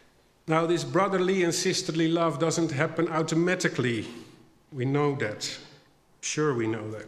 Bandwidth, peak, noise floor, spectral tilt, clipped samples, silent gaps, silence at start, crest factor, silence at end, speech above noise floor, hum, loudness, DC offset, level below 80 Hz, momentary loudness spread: 14 kHz; -8 dBFS; -58 dBFS; -5 dB/octave; under 0.1%; none; 0.45 s; 20 dB; 0 s; 32 dB; none; -27 LUFS; under 0.1%; -68 dBFS; 10 LU